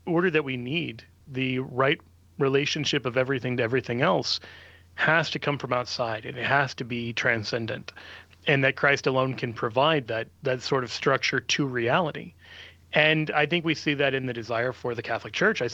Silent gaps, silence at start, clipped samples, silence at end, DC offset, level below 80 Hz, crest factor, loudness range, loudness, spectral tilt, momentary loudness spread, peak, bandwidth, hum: none; 0.05 s; under 0.1%; 0 s; under 0.1%; -64 dBFS; 20 dB; 2 LU; -25 LUFS; -5 dB/octave; 10 LU; -6 dBFS; 8.4 kHz; none